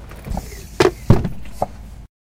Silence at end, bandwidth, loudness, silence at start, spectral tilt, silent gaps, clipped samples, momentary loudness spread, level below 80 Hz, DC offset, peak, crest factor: 0.15 s; 16.5 kHz; -21 LUFS; 0 s; -6.5 dB/octave; none; under 0.1%; 19 LU; -30 dBFS; under 0.1%; 0 dBFS; 20 dB